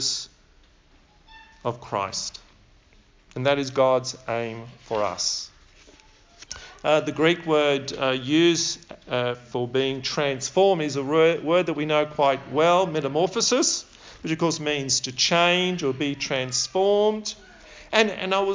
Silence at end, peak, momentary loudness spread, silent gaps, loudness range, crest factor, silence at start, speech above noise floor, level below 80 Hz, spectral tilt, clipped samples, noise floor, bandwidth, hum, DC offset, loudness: 0 s; -4 dBFS; 12 LU; none; 6 LU; 20 dB; 0 s; 34 dB; -58 dBFS; -3.5 dB/octave; under 0.1%; -57 dBFS; 7.8 kHz; none; under 0.1%; -23 LUFS